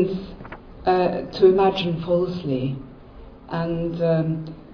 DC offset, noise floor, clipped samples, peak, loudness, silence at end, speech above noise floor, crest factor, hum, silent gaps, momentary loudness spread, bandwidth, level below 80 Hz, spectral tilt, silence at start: under 0.1%; -42 dBFS; under 0.1%; -4 dBFS; -22 LUFS; 0 s; 21 dB; 18 dB; none; none; 18 LU; 5.4 kHz; -46 dBFS; -9 dB/octave; 0 s